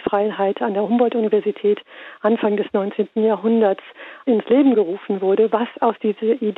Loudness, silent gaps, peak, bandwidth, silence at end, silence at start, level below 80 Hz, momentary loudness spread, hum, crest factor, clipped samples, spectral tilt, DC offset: -19 LUFS; none; -6 dBFS; 4.1 kHz; 0.05 s; 0 s; -68 dBFS; 6 LU; none; 14 dB; under 0.1%; -9.5 dB/octave; under 0.1%